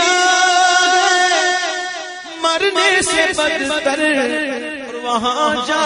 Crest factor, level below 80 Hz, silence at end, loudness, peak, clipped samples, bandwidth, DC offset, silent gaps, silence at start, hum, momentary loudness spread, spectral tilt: 14 dB; -52 dBFS; 0 s; -15 LUFS; -2 dBFS; under 0.1%; 11 kHz; under 0.1%; none; 0 s; none; 12 LU; -0.5 dB/octave